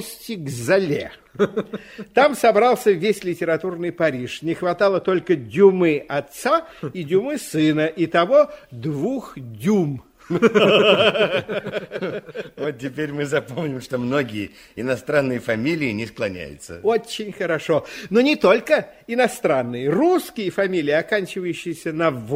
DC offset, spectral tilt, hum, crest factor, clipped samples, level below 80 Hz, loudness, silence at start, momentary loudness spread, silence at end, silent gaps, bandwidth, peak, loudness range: under 0.1%; -5.5 dB/octave; none; 20 dB; under 0.1%; -58 dBFS; -20 LUFS; 0 s; 13 LU; 0 s; none; 16 kHz; -2 dBFS; 5 LU